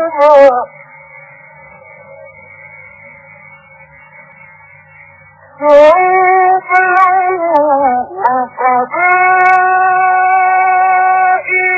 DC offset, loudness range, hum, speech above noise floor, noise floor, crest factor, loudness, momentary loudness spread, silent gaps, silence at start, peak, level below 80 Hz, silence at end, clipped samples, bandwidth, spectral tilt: under 0.1%; 5 LU; none; 32 dB; -40 dBFS; 12 dB; -9 LUFS; 8 LU; none; 0 s; 0 dBFS; -56 dBFS; 0 s; 0.9%; 8 kHz; -5.5 dB/octave